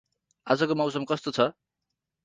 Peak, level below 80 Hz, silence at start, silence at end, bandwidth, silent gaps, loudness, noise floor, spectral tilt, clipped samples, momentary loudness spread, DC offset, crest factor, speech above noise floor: -6 dBFS; -70 dBFS; 0.45 s; 0.75 s; 9.6 kHz; none; -27 LUFS; -85 dBFS; -5.5 dB/octave; under 0.1%; 5 LU; under 0.1%; 22 dB; 58 dB